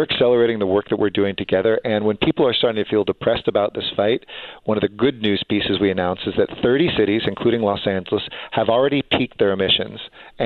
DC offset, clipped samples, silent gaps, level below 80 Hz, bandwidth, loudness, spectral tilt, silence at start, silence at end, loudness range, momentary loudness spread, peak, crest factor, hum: under 0.1%; under 0.1%; none; -50 dBFS; 4.6 kHz; -19 LUFS; -8.5 dB/octave; 0 s; 0 s; 2 LU; 6 LU; -4 dBFS; 14 dB; none